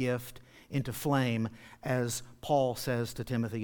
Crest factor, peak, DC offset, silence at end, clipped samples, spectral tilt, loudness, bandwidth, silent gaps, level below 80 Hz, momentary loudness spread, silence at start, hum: 18 dB; -16 dBFS; under 0.1%; 0 s; under 0.1%; -5.5 dB/octave; -33 LUFS; 19 kHz; none; -58 dBFS; 9 LU; 0 s; none